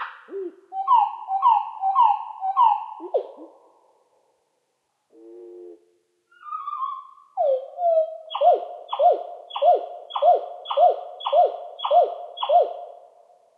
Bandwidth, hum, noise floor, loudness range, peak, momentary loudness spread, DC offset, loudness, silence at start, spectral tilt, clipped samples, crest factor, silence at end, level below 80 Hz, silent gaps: 4.5 kHz; none; -73 dBFS; 15 LU; -6 dBFS; 15 LU; under 0.1%; -22 LUFS; 0 s; -2.5 dB/octave; under 0.1%; 16 dB; 0.65 s; under -90 dBFS; none